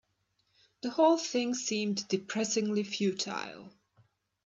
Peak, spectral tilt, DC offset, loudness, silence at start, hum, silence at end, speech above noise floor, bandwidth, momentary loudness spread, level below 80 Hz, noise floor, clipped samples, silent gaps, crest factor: -12 dBFS; -3.5 dB/octave; under 0.1%; -31 LUFS; 0.85 s; none; 0.75 s; 46 dB; 8 kHz; 13 LU; -80 dBFS; -76 dBFS; under 0.1%; none; 20 dB